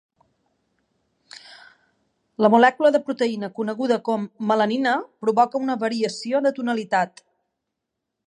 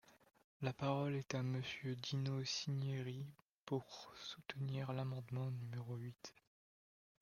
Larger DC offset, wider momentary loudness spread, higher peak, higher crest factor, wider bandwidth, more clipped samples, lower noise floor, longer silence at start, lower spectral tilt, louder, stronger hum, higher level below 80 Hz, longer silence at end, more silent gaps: neither; about the same, 11 LU vs 11 LU; first, -2 dBFS vs -22 dBFS; about the same, 20 dB vs 22 dB; about the same, 10.5 kHz vs 9.8 kHz; neither; second, -81 dBFS vs under -90 dBFS; first, 1.35 s vs 0.05 s; about the same, -5.5 dB/octave vs -5.5 dB/octave; first, -21 LUFS vs -44 LUFS; neither; about the same, -78 dBFS vs -78 dBFS; first, 1.2 s vs 0.9 s; second, none vs 0.44-0.60 s, 3.42-3.67 s